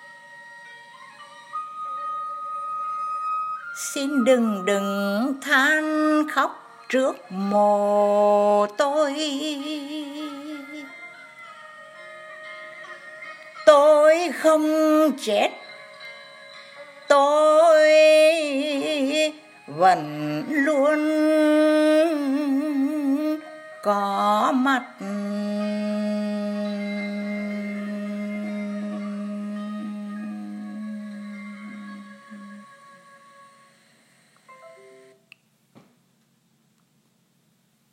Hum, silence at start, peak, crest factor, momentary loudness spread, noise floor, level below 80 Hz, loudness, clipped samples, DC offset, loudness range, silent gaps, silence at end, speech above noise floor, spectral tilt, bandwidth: none; 0 s; 0 dBFS; 22 dB; 24 LU; -65 dBFS; -80 dBFS; -21 LUFS; under 0.1%; under 0.1%; 16 LU; none; 3.25 s; 45 dB; -4.5 dB/octave; 15.5 kHz